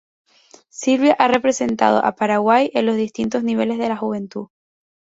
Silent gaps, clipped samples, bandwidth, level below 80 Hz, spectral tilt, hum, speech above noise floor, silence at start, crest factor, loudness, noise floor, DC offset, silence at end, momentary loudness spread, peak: none; under 0.1%; 8 kHz; -60 dBFS; -4.5 dB/octave; none; 33 dB; 0.75 s; 16 dB; -18 LUFS; -51 dBFS; under 0.1%; 0.6 s; 10 LU; -2 dBFS